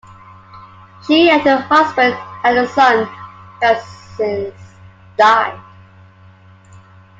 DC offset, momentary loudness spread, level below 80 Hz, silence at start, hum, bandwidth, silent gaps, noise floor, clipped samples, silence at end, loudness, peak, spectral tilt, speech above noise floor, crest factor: under 0.1%; 19 LU; -58 dBFS; 0.55 s; none; 7.8 kHz; none; -44 dBFS; under 0.1%; 1.6 s; -14 LUFS; 0 dBFS; -5 dB/octave; 30 dB; 16 dB